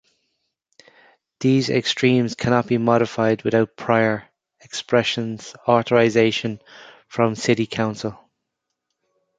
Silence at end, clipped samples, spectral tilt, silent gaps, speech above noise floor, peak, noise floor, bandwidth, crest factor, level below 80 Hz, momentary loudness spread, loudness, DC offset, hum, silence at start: 1.25 s; under 0.1%; -5.5 dB/octave; none; 60 dB; -2 dBFS; -80 dBFS; 9.2 kHz; 20 dB; -58 dBFS; 13 LU; -20 LUFS; under 0.1%; none; 1.4 s